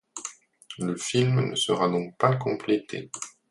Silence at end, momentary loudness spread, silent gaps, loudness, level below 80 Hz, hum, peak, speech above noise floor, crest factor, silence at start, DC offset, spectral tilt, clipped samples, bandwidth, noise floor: 0.2 s; 14 LU; none; -26 LUFS; -64 dBFS; none; -6 dBFS; 21 dB; 20 dB; 0.15 s; under 0.1%; -5 dB/octave; under 0.1%; 11.5 kHz; -46 dBFS